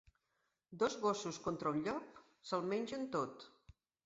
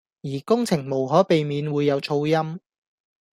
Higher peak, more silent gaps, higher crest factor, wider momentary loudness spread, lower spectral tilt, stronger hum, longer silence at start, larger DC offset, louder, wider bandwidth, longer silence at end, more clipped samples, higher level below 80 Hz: second, -22 dBFS vs -4 dBFS; neither; about the same, 18 dB vs 20 dB; first, 20 LU vs 13 LU; second, -4.5 dB/octave vs -6.5 dB/octave; neither; first, 0.7 s vs 0.25 s; neither; second, -40 LUFS vs -22 LUFS; second, 7.6 kHz vs 14.5 kHz; second, 0.55 s vs 0.75 s; neither; second, -74 dBFS vs -64 dBFS